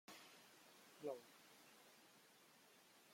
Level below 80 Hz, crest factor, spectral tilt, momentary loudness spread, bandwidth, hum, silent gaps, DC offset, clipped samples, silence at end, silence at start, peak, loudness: under -90 dBFS; 24 dB; -3 dB/octave; 15 LU; 16.5 kHz; none; none; under 0.1%; under 0.1%; 0 s; 0.1 s; -36 dBFS; -60 LUFS